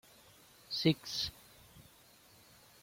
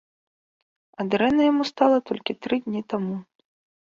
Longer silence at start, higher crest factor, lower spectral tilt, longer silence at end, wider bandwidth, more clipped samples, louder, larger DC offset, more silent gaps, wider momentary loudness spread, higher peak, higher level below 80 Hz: second, 0.7 s vs 1 s; about the same, 24 dB vs 20 dB; second, -5 dB/octave vs -6.5 dB/octave; first, 1 s vs 0.75 s; first, 16.5 kHz vs 7.4 kHz; neither; second, -35 LUFS vs -23 LUFS; neither; neither; first, 26 LU vs 11 LU; second, -16 dBFS vs -4 dBFS; about the same, -66 dBFS vs -62 dBFS